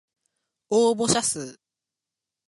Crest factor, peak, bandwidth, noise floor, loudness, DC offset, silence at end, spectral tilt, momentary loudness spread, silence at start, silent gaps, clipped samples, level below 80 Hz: 20 dB; -8 dBFS; 11.5 kHz; -88 dBFS; -23 LUFS; under 0.1%; 0.95 s; -3 dB/octave; 12 LU; 0.7 s; none; under 0.1%; -62 dBFS